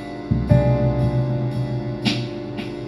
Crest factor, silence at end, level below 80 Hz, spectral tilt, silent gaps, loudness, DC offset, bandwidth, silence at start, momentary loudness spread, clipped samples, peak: 18 dB; 0 s; -34 dBFS; -8 dB/octave; none; -21 LUFS; under 0.1%; 11 kHz; 0 s; 10 LU; under 0.1%; -2 dBFS